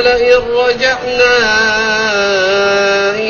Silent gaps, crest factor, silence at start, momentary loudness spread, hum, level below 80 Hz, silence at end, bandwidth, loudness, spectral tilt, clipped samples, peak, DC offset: none; 12 dB; 0 s; 3 LU; none; -38 dBFS; 0 s; 7 kHz; -11 LUFS; -2.5 dB/octave; under 0.1%; 0 dBFS; under 0.1%